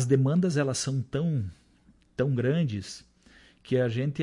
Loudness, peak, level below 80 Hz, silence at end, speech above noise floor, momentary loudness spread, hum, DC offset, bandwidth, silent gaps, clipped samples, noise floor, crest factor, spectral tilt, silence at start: -28 LUFS; -10 dBFS; -60 dBFS; 0 s; 34 dB; 15 LU; none; under 0.1%; 11.5 kHz; none; under 0.1%; -61 dBFS; 18 dB; -6.5 dB/octave; 0 s